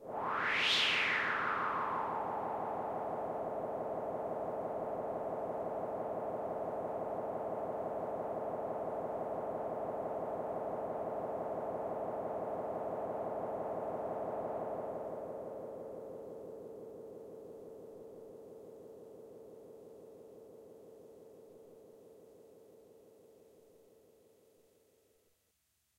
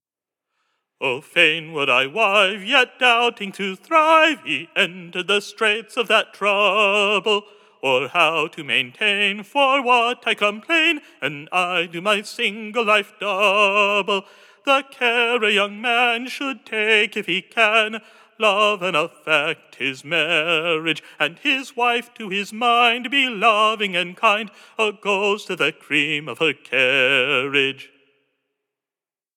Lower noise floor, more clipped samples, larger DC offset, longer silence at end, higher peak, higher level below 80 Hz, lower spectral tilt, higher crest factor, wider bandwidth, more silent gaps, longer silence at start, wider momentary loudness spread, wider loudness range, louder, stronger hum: second, -79 dBFS vs under -90 dBFS; neither; neither; first, 2.15 s vs 1.5 s; second, -20 dBFS vs -2 dBFS; first, -72 dBFS vs under -90 dBFS; about the same, -4 dB/octave vs -3 dB/octave; about the same, 20 dB vs 20 dB; about the same, 16 kHz vs 17 kHz; neither; second, 0 s vs 1 s; first, 21 LU vs 9 LU; first, 19 LU vs 2 LU; second, -38 LUFS vs -19 LUFS; neither